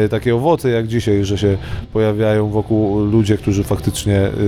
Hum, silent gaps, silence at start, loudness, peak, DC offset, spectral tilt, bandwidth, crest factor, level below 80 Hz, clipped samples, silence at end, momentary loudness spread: none; none; 0 s; -17 LUFS; -2 dBFS; under 0.1%; -7 dB/octave; 14.5 kHz; 14 dB; -34 dBFS; under 0.1%; 0 s; 3 LU